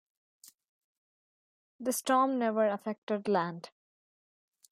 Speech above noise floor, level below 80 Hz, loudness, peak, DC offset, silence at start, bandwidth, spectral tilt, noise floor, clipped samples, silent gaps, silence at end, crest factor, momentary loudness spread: over 60 dB; -84 dBFS; -31 LUFS; -16 dBFS; under 0.1%; 1.8 s; 16 kHz; -4.5 dB/octave; under -90 dBFS; under 0.1%; 2.98-3.07 s; 1.05 s; 20 dB; 11 LU